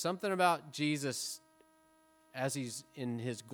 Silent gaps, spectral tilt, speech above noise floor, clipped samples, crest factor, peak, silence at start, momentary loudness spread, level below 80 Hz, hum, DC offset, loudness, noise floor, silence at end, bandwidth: none; -4 dB/octave; 32 dB; under 0.1%; 22 dB; -14 dBFS; 0 s; 11 LU; -86 dBFS; none; under 0.1%; -36 LUFS; -67 dBFS; 0 s; over 20 kHz